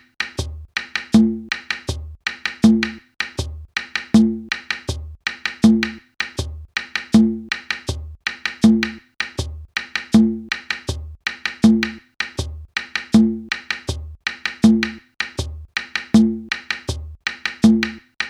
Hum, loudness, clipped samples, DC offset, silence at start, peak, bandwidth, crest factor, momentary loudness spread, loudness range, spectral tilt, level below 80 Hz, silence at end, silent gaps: none; -20 LUFS; under 0.1%; under 0.1%; 0.2 s; 0 dBFS; 11.5 kHz; 20 dB; 12 LU; 0 LU; -5 dB/octave; -38 dBFS; 0 s; none